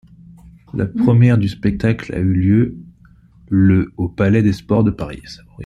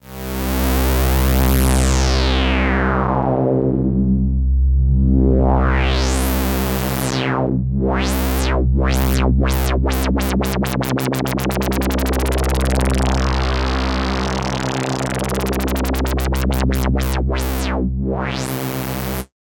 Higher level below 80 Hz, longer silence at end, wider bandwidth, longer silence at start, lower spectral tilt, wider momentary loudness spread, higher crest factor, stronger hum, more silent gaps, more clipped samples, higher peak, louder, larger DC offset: second, -40 dBFS vs -20 dBFS; second, 0 s vs 0.15 s; second, 7.6 kHz vs 18 kHz; first, 0.75 s vs 0.05 s; first, -9 dB/octave vs -5.5 dB/octave; first, 14 LU vs 5 LU; about the same, 14 dB vs 16 dB; neither; neither; neither; about the same, -2 dBFS vs 0 dBFS; about the same, -16 LUFS vs -18 LUFS; neither